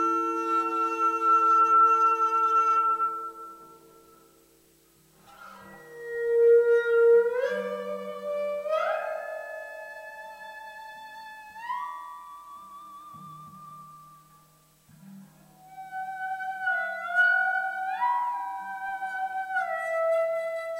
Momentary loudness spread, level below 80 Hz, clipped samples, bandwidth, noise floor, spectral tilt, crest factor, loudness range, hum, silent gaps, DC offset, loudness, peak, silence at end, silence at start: 25 LU; -74 dBFS; under 0.1%; 16 kHz; -61 dBFS; -4 dB/octave; 16 dB; 19 LU; none; none; under 0.1%; -25 LUFS; -12 dBFS; 0 s; 0 s